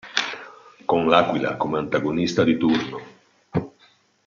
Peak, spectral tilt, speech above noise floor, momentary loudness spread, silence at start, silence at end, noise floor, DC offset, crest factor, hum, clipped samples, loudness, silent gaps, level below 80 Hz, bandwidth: -2 dBFS; -5.5 dB/octave; 37 dB; 15 LU; 0.05 s; 0.55 s; -58 dBFS; under 0.1%; 22 dB; none; under 0.1%; -22 LUFS; none; -58 dBFS; 7.4 kHz